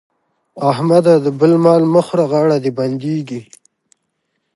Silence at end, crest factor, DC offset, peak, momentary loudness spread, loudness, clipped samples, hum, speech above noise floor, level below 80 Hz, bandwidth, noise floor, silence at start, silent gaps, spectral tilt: 1.15 s; 14 dB; under 0.1%; 0 dBFS; 10 LU; -14 LUFS; under 0.1%; none; 57 dB; -66 dBFS; 11.5 kHz; -70 dBFS; 0.55 s; none; -8 dB/octave